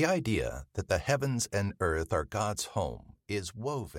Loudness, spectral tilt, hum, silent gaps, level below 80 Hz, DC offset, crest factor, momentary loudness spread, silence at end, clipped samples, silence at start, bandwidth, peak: -32 LUFS; -5 dB/octave; none; none; -48 dBFS; under 0.1%; 18 dB; 8 LU; 0 s; under 0.1%; 0 s; 16 kHz; -14 dBFS